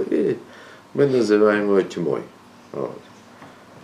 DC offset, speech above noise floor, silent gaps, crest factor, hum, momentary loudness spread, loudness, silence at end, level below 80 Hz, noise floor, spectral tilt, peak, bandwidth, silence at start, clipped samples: under 0.1%; 25 dB; none; 18 dB; none; 21 LU; -21 LUFS; 0.05 s; -72 dBFS; -45 dBFS; -6.5 dB/octave; -4 dBFS; 11 kHz; 0 s; under 0.1%